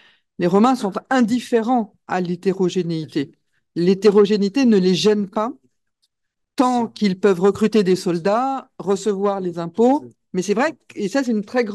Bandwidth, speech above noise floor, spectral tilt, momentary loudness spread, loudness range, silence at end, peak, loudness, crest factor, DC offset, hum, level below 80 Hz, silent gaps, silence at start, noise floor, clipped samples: 12.5 kHz; 59 dB; -6 dB/octave; 10 LU; 3 LU; 0 s; -2 dBFS; -19 LUFS; 16 dB; under 0.1%; none; -66 dBFS; none; 0.4 s; -78 dBFS; under 0.1%